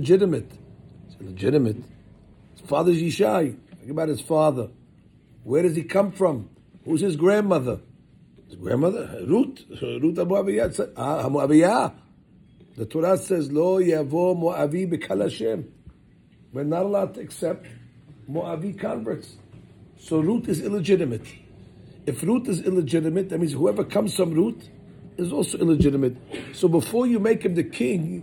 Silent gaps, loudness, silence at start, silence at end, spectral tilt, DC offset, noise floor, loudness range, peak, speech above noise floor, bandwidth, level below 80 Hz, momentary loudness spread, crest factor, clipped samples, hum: none; -23 LUFS; 0 s; 0 s; -6.5 dB/octave; under 0.1%; -54 dBFS; 6 LU; -6 dBFS; 32 dB; 18 kHz; -52 dBFS; 13 LU; 18 dB; under 0.1%; none